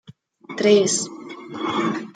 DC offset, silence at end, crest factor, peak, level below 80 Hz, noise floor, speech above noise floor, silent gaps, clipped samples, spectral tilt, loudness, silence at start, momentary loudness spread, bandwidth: under 0.1%; 0.05 s; 18 dB; -4 dBFS; -70 dBFS; -42 dBFS; 22 dB; none; under 0.1%; -3.5 dB/octave; -20 LUFS; 0.1 s; 19 LU; 9.4 kHz